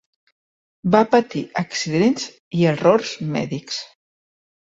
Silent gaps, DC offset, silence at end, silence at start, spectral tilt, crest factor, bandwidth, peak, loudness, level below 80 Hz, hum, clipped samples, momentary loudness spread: 2.40-2.51 s; under 0.1%; 0.8 s; 0.85 s; -5.5 dB/octave; 18 dB; 8 kHz; -2 dBFS; -20 LUFS; -60 dBFS; none; under 0.1%; 12 LU